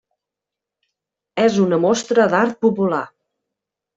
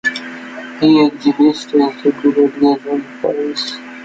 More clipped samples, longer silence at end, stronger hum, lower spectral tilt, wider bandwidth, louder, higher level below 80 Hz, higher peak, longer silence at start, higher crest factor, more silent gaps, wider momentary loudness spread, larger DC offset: neither; first, 0.9 s vs 0 s; neither; about the same, -5.5 dB/octave vs -5.5 dB/octave; about the same, 8 kHz vs 7.8 kHz; about the same, -17 LUFS vs -15 LUFS; second, -64 dBFS vs -58 dBFS; about the same, -2 dBFS vs -2 dBFS; first, 1.35 s vs 0.05 s; about the same, 16 dB vs 14 dB; neither; second, 9 LU vs 13 LU; neither